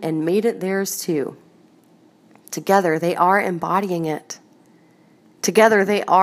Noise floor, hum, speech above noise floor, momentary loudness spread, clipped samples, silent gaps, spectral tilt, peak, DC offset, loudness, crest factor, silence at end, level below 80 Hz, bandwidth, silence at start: -53 dBFS; none; 35 dB; 15 LU; under 0.1%; none; -4.5 dB/octave; 0 dBFS; under 0.1%; -19 LUFS; 20 dB; 0 s; -74 dBFS; 15.5 kHz; 0 s